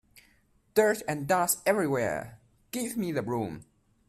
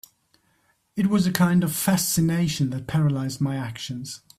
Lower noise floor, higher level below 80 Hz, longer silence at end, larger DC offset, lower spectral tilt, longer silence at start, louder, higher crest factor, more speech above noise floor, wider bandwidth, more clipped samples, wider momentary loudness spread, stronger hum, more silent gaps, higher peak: about the same, -66 dBFS vs -66 dBFS; second, -64 dBFS vs -54 dBFS; first, 0.45 s vs 0.2 s; neither; about the same, -4.5 dB/octave vs -5 dB/octave; second, 0.75 s vs 0.95 s; second, -29 LUFS vs -23 LUFS; about the same, 20 dB vs 22 dB; second, 38 dB vs 44 dB; about the same, 16 kHz vs 16 kHz; neither; about the same, 12 LU vs 12 LU; neither; neither; second, -10 dBFS vs -2 dBFS